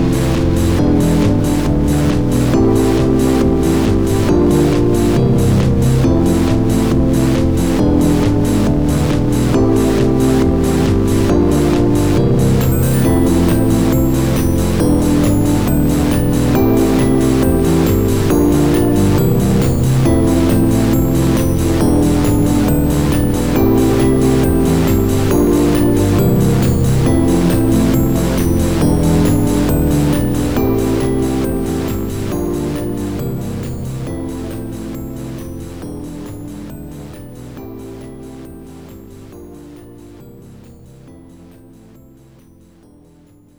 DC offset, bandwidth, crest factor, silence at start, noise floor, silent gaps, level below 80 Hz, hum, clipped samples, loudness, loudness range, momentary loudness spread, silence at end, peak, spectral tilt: 4%; over 20 kHz; 10 dB; 0 s; -46 dBFS; none; -24 dBFS; none; under 0.1%; -14 LUFS; 13 LU; 13 LU; 0 s; -4 dBFS; -7 dB/octave